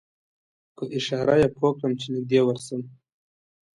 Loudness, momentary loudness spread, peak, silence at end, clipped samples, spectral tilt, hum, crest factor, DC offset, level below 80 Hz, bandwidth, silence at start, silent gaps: -24 LUFS; 14 LU; -8 dBFS; 0.9 s; under 0.1%; -6 dB/octave; none; 18 dB; under 0.1%; -58 dBFS; 11.5 kHz; 0.8 s; none